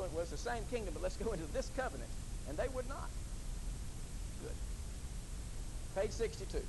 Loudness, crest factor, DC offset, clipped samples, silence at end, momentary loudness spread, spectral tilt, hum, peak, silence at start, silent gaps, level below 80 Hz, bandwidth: -43 LUFS; 16 dB; under 0.1%; under 0.1%; 0 s; 8 LU; -5 dB/octave; none; -26 dBFS; 0 s; none; -44 dBFS; 12 kHz